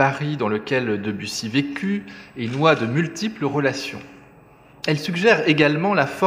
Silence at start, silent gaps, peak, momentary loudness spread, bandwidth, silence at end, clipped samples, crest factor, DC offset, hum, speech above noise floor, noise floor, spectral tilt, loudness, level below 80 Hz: 0 s; none; -2 dBFS; 12 LU; 15.5 kHz; 0 s; under 0.1%; 20 dB; under 0.1%; none; 28 dB; -49 dBFS; -5.5 dB/octave; -21 LUFS; -62 dBFS